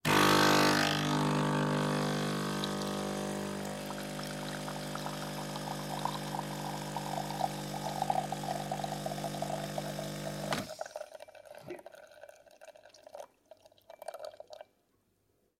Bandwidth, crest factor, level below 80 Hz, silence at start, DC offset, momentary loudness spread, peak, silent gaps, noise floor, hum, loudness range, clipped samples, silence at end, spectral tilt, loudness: 16.5 kHz; 22 dB; -62 dBFS; 0.05 s; under 0.1%; 22 LU; -14 dBFS; none; -75 dBFS; none; 19 LU; under 0.1%; 1 s; -4 dB/octave; -33 LUFS